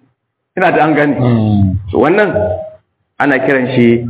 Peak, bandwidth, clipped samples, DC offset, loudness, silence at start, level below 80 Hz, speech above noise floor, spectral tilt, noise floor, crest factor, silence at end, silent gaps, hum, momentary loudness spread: 0 dBFS; 4 kHz; 0.3%; under 0.1%; -12 LUFS; 0.55 s; -34 dBFS; 53 dB; -11.5 dB/octave; -63 dBFS; 12 dB; 0 s; none; none; 8 LU